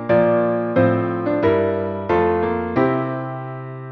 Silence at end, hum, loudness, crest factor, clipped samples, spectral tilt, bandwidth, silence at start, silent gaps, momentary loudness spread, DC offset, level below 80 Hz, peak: 0 s; none; -19 LUFS; 16 dB; under 0.1%; -10 dB/octave; 5.8 kHz; 0 s; none; 11 LU; under 0.1%; -48 dBFS; -4 dBFS